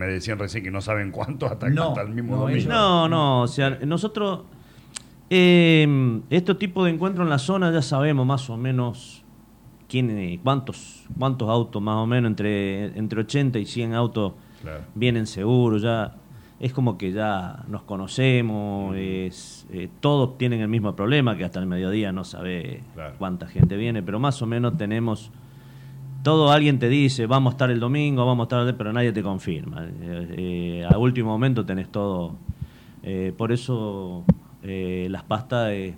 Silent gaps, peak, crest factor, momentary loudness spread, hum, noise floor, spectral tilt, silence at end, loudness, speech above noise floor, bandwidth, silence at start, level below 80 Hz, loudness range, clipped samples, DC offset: none; -6 dBFS; 16 dB; 14 LU; none; -49 dBFS; -7 dB/octave; 0 s; -23 LUFS; 27 dB; 11 kHz; 0 s; -48 dBFS; 6 LU; under 0.1%; under 0.1%